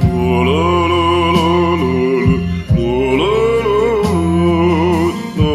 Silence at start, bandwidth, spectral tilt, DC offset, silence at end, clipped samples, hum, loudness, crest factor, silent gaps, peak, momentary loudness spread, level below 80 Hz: 0 s; 13 kHz; -7 dB/octave; under 0.1%; 0 s; under 0.1%; none; -14 LUFS; 12 dB; none; 0 dBFS; 3 LU; -28 dBFS